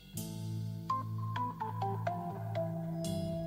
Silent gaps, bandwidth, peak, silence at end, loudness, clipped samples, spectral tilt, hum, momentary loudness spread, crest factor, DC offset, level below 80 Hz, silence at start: none; 16 kHz; -20 dBFS; 0 s; -38 LUFS; under 0.1%; -6.5 dB/octave; none; 4 LU; 18 dB; under 0.1%; -62 dBFS; 0 s